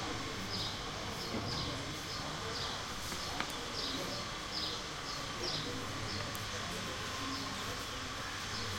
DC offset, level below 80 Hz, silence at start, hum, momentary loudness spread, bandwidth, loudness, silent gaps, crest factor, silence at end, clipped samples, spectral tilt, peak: under 0.1%; -54 dBFS; 0 s; none; 3 LU; 16.5 kHz; -38 LUFS; none; 22 dB; 0 s; under 0.1%; -3 dB/octave; -16 dBFS